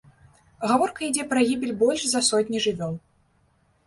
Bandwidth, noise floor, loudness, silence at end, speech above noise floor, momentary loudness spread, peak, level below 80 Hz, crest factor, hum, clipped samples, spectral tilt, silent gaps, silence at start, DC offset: 11.5 kHz; -64 dBFS; -23 LUFS; 0.9 s; 41 dB; 10 LU; -8 dBFS; -62 dBFS; 18 dB; none; under 0.1%; -3 dB/octave; none; 0.6 s; under 0.1%